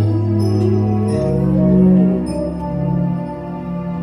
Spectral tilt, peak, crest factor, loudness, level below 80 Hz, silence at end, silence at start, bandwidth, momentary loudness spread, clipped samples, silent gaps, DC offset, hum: -10 dB/octave; -2 dBFS; 14 dB; -17 LUFS; -34 dBFS; 0 s; 0 s; 11 kHz; 12 LU; under 0.1%; none; under 0.1%; none